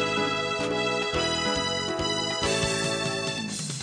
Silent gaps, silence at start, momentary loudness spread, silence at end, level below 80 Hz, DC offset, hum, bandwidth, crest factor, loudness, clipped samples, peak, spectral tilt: none; 0 s; 4 LU; 0 s; -48 dBFS; under 0.1%; 60 Hz at -55 dBFS; 10.5 kHz; 16 dB; -26 LUFS; under 0.1%; -12 dBFS; -3 dB/octave